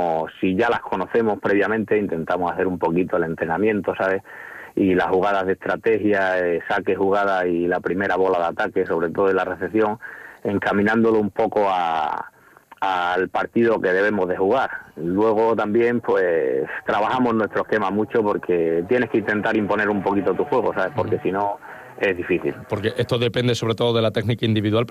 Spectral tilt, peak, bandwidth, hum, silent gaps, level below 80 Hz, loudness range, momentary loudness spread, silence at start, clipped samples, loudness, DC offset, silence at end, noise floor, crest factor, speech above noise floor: -7 dB/octave; -8 dBFS; 13.5 kHz; none; none; -58 dBFS; 2 LU; 5 LU; 0 s; under 0.1%; -21 LUFS; under 0.1%; 0 s; -49 dBFS; 12 dB; 29 dB